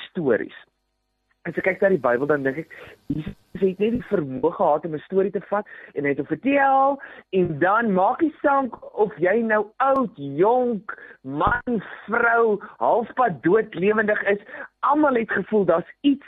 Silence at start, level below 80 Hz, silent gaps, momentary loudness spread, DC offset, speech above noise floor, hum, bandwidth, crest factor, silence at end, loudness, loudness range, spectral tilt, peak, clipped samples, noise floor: 0 s; -52 dBFS; none; 11 LU; under 0.1%; 52 dB; none; 4.1 kHz; 16 dB; 0.1 s; -22 LUFS; 4 LU; -9 dB/octave; -6 dBFS; under 0.1%; -74 dBFS